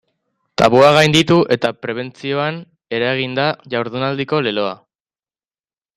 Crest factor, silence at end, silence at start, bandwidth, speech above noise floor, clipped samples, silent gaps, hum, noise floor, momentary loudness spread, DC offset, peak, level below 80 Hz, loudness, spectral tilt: 18 dB; 1.2 s; 0.6 s; 15 kHz; over 74 dB; under 0.1%; none; none; under -90 dBFS; 15 LU; under 0.1%; 0 dBFS; -52 dBFS; -16 LUFS; -5 dB/octave